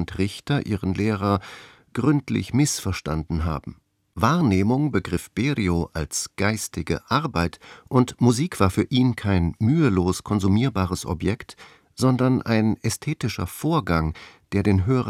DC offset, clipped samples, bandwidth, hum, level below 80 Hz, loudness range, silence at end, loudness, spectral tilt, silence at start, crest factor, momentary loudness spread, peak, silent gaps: under 0.1%; under 0.1%; 16.5 kHz; none; -46 dBFS; 3 LU; 0 s; -23 LUFS; -6 dB/octave; 0 s; 20 dB; 8 LU; -4 dBFS; none